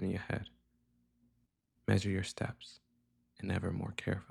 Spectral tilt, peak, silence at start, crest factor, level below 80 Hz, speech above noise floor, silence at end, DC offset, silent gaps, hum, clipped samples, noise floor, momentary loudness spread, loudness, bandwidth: -6 dB/octave; -16 dBFS; 0 s; 22 dB; -62 dBFS; 41 dB; 0.05 s; under 0.1%; none; 60 Hz at -65 dBFS; under 0.1%; -77 dBFS; 16 LU; -38 LUFS; 12 kHz